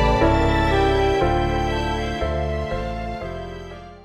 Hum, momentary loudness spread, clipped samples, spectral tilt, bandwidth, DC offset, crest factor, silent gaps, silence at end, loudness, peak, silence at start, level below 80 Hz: none; 14 LU; under 0.1%; -6.5 dB/octave; 13 kHz; under 0.1%; 16 dB; none; 0 s; -21 LUFS; -6 dBFS; 0 s; -28 dBFS